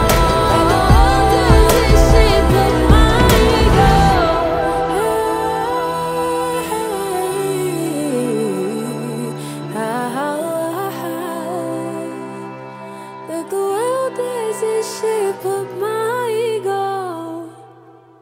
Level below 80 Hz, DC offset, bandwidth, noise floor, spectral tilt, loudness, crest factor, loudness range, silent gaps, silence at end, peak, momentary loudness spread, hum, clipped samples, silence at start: -22 dBFS; under 0.1%; 16 kHz; -44 dBFS; -5.5 dB/octave; -16 LUFS; 16 dB; 11 LU; none; 0.55 s; 0 dBFS; 14 LU; none; under 0.1%; 0 s